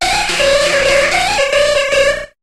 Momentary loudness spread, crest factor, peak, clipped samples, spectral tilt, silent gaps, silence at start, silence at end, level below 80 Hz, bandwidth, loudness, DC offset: 2 LU; 12 dB; 0 dBFS; under 0.1%; -1.5 dB/octave; none; 0 s; 0.15 s; -34 dBFS; 14 kHz; -12 LUFS; under 0.1%